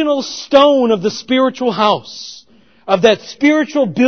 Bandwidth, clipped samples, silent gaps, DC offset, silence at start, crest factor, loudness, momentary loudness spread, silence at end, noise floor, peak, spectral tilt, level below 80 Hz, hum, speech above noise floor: 6.6 kHz; under 0.1%; none; 0.3%; 0 s; 14 dB; -14 LUFS; 15 LU; 0 s; -46 dBFS; 0 dBFS; -4.5 dB/octave; -58 dBFS; none; 33 dB